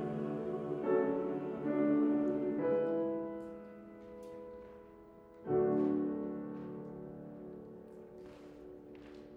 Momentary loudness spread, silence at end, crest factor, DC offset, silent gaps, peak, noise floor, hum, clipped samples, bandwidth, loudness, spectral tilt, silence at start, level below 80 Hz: 21 LU; 0 s; 16 dB; under 0.1%; none; -22 dBFS; -56 dBFS; none; under 0.1%; 4.4 kHz; -35 LUFS; -10 dB/octave; 0 s; -70 dBFS